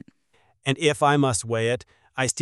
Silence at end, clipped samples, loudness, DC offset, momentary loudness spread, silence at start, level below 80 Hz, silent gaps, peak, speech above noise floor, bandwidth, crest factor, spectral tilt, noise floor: 0 s; under 0.1%; -23 LUFS; under 0.1%; 11 LU; 0.65 s; -58 dBFS; none; -6 dBFS; 43 dB; 13 kHz; 18 dB; -4 dB/octave; -65 dBFS